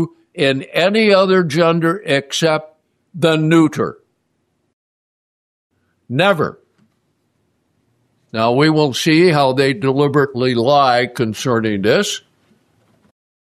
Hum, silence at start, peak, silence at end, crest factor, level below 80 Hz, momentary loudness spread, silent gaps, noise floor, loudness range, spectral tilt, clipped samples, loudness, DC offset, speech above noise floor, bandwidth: none; 0 s; -2 dBFS; 1.4 s; 16 dB; -60 dBFS; 9 LU; 4.73-5.70 s; -67 dBFS; 9 LU; -5.5 dB/octave; under 0.1%; -15 LUFS; under 0.1%; 53 dB; 13.5 kHz